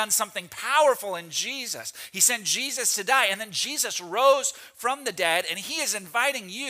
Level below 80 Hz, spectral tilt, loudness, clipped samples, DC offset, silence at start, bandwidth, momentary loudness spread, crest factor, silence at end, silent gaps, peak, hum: -78 dBFS; 0 dB/octave; -24 LUFS; under 0.1%; under 0.1%; 0 s; 16 kHz; 10 LU; 20 dB; 0 s; none; -6 dBFS; none